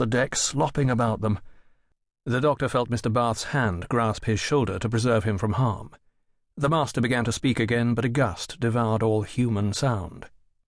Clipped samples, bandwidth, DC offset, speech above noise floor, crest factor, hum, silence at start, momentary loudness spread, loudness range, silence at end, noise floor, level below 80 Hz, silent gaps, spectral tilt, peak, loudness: under 0.1%; 11 kHz; under 0.1%; 42 dB; 14 dB; none; 0 s; 4 LU; 2 LU; 0.4 s; -66 dBFS; -48 dBFS; none; -5.5 dB/octave; -10 dBFS; -25 LUFS